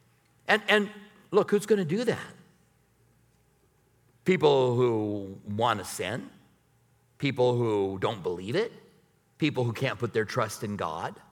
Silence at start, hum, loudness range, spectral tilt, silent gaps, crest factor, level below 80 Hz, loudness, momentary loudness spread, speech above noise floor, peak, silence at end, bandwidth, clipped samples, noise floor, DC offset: 0.45 s; none; 3 LU; -5.5 dB/octave; none; 22 dB; -70 dBFS; -28 LUFS; 13 LU; 39 dB; -6 dBFS; 0.2 s; 17.5 kHz; under 0.1%; -66 dBFS; under 0.1%